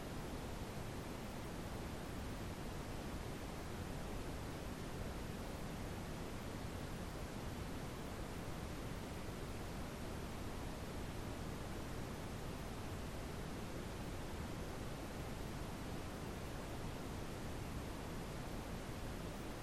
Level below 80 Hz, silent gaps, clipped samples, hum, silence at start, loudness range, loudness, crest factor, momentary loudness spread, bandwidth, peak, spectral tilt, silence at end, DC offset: -52 dBFS; none; under 0.1%; none; 0 s; 0 LU; -48 LUFS; 12 dB; 1 LU; 16 kHz; -34 dBFS; -5.5 dB/octave; 0 s; under 0.1%